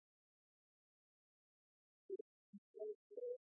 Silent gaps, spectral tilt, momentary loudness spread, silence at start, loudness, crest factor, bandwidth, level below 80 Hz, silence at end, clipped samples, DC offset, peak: 2.21-2.74 s, 2.95-3.10 s; 11 dB/octave; 13 LU; 2.1 s; -53 LUFS; 18 dB; 0.8 kHz; under -90 dBFS; 0.15 s; under 0.1%; under 0.1%; -40 dBFS